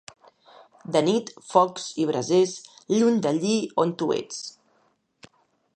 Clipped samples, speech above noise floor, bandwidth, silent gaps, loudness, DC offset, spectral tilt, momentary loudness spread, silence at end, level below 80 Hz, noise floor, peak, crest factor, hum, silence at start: under 0.1%; 43 dB; 9.6 kHz; none; -24 LUFS; under 0.1%; -5 dB/octave; 14 LU; 1.25 s; -74 dBFS; -67 dBFS; -4 dBFS; 22 dB; none; 0.9 s